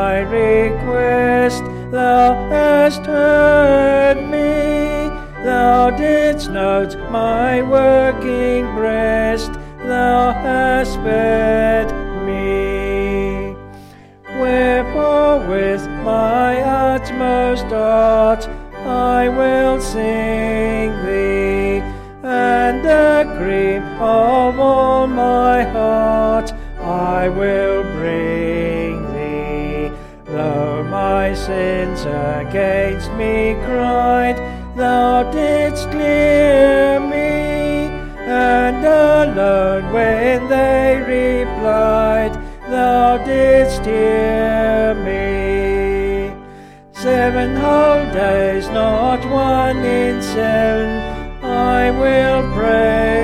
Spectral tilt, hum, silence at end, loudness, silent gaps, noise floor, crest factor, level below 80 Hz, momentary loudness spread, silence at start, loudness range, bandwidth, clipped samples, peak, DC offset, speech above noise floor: -6.5 dB/octave; none; 0 s; -15 LUFS; none; -40 dBFS; 14 dB; -30 dBFS; 9 LU; 0 s; 5 LU; 14.5 kHz; under 0.1%; -2 dBFS; under 0.1%; 26 dB